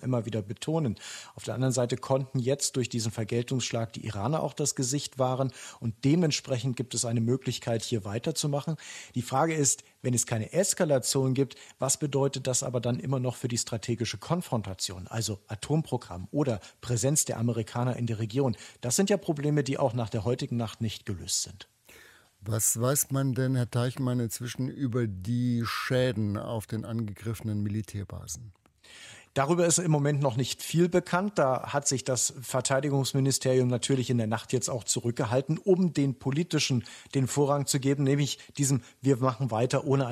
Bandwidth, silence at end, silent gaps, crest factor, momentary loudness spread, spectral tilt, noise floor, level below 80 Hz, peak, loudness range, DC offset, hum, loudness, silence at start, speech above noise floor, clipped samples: 16 kHz; 0 s; none; 20 dB; 9 LU; -5 dB/octave; -56 dBFS; -62 dBFS; -10 dBFS; 4 LU; under 0.1%; none; -29 LUFS; 0 s; 27 dB; under 0.1%